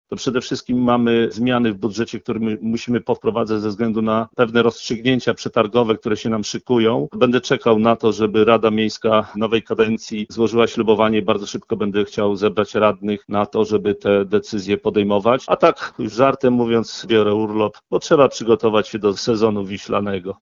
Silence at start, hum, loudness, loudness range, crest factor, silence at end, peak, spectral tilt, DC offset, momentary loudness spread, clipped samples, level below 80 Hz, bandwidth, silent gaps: 0.1 s; none; -18 LUFS; 3 LU; 18 dB; 0.1 s; 0 dBFS; -5.5 dB/octave; under 0.1%; 7 LU; under 0.1%; -52 dBFS; 7.6 kHz; none